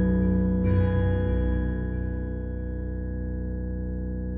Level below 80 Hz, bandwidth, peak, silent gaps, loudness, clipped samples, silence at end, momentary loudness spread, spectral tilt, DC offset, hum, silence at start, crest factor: -30 dBFS; 3.5 kHz; -12 dBFS; none; -28 LUFS; under 0.1%; 0 s; 9 LU; -13 dB/octave; under 0.1%; none; 0 s; 14 dB